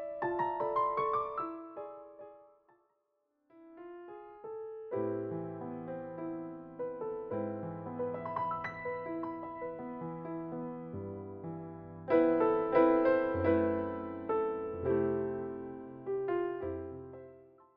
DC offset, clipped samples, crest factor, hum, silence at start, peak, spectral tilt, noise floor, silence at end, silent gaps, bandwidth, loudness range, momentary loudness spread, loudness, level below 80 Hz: under 0.1%; under 0.1%; 22 dB; none; 0 s; -14 dBFS; -7 dB/octave; -80 dBFS; 0.15 s; none; 5 kHz; 12 LU; 18 LU; -35 LUFS; -66 dBFS